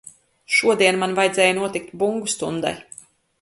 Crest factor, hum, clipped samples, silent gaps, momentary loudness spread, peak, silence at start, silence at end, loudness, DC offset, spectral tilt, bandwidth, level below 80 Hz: 20 dB; none; under 0.1%; none; 10 LU; -2 dBFS; 0.5 s; 0.6 s; -20 LUFS; under 0.1%; -3 dB/octave; 11.5 kHz; -62 dBFS